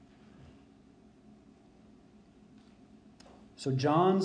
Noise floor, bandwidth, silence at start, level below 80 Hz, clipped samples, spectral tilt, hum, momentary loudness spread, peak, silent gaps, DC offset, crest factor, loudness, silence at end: -59 dBFS; 9.8 kHz; 3.6 s; -70 dBFS; under 0.1%; -7 dB/octave; none; 30 LU; -14 dBFS; none; under 0.1%; 20 dB; -30 LUFS; 0 s